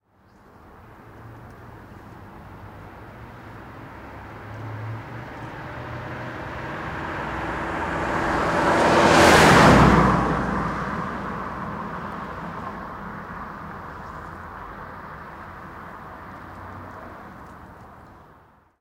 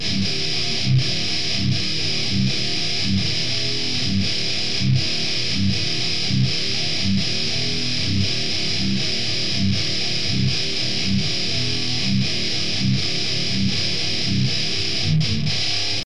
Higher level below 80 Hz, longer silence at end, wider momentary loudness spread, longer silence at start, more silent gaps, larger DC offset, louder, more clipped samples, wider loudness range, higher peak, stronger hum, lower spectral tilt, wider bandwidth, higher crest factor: first, -40 dBFS vs -46 dBFS; first, 0.7 s vs 0 s; first, 27 LU vs 1 LU; first, 0.65 s vs 0 s; neither; second, under 0.1% vs 6%; about the same, -20 LUFS vs -20 LUFS; neither; first, 24 LU vs 0 LU; about the same, -4 dBFS vs -6 dBFS; neither; about the same, -5 dB/octave vs -4 dB/octave; first, 16 kHz vs 11 kHz; first, 20 dB vs 14 dB